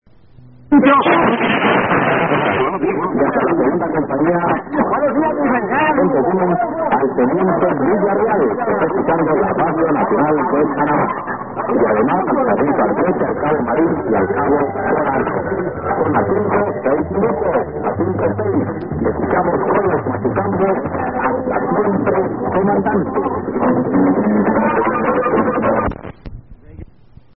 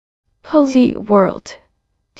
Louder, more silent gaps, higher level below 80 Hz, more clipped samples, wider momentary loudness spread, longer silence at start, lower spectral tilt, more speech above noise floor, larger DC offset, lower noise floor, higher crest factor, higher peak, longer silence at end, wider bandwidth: about the same, -16 LUFS vs -14 LUFS; neither; first, -42 dBFS vs -52 dBFS; neither; about the same, 5 LU vs 6 LU; first, 0.7 s vs 0.45 s; first, -12.5 dB/octave vs -7 dB/octave; second, 30 dB vs 53 dB; first, 0.5% vs under 0.1%; second, -45 dBFS vs -66 dBFS; about the same, 16 dB vs 16 dB; about the same, 0 dBFS vs 0 dBFS; about the same, 0.55 s vs 0.65 s; second, 3.7 kHz vs 8 kHz